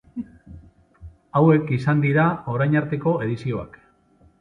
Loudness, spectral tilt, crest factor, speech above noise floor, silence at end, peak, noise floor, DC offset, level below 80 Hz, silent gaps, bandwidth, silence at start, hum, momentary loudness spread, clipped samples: -21 LUFS; -9.5 dB/octave; 18 dB; 37 dB; 0.75 s; -4 dBFS; -57 dBFS; under 0.1%; -52 dBFS; none; 6 kHz; 0.15 s; none; 18 LU; under 0.1%